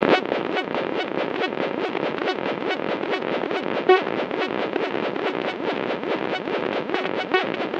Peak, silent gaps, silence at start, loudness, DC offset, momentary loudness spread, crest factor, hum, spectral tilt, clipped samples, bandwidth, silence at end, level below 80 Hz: 0 dBFS; none; 0 s; -24 LUFS; under 0.1%; 6 LU; 24 dB; none; -6 dB/octave; under 0.1%; 7.8 kHz; 0 s; -70 dBFS